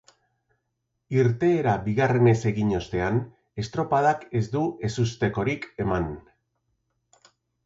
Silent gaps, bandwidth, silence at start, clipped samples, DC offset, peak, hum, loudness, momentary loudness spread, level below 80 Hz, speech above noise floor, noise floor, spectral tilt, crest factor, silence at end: none; 7.8 kHz; 1.1 s; under 0.1%; under 0.1%; -8 dBFS; none; -25 LUFS; 9 LU; -48 dBFS; 55 dB; -78 dBFS; -7.5 dB/octave; 18 dB; 1.45 s